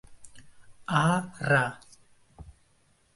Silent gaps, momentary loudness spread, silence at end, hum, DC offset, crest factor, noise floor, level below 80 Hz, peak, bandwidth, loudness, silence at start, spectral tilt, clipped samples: none; 18 LU; 0.65 s; none; under 0.1%; 22 dB; -66 dBFS; -60 dBFS; -10 dBFS; 11.5 kHz; -26 LUFS; 0.1 s; -5.5 dB/octave; under 0.1%